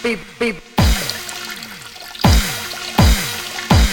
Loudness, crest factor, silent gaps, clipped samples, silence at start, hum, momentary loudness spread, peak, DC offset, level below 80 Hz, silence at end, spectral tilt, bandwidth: -18 LUFS; 16 dB; none; under 0.1%; 0 s; none; 14 LU; 0 dBFS; under 0.1%; -22 dBFS; 0 s; -4.5 dB/octave; 19.5 kHz